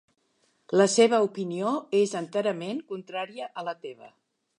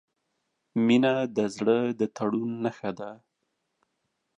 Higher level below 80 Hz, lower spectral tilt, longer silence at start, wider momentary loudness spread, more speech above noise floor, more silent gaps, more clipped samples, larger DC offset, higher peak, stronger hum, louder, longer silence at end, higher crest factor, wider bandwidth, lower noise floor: second, -82 dBFS vs -74 dBFS; second, -4 dB/octave vs -6.5 dB/octave; about the same, 0.7 s vs 0.75 s; about the same, 15 LU vs 13 LU; second, 44 dB vs 53 dB; neither; neither; neither; first, -6 dBFS vs -10 dBFS; neither; about the same, -26 LUFS vs -27 LUFS; second, 0.5 s vs 1.2 s; about the same, 20 dB vs 18 dB; first, 11 kHz vs 9.6 kHz; second, -70 dBFS vs -79 dBFS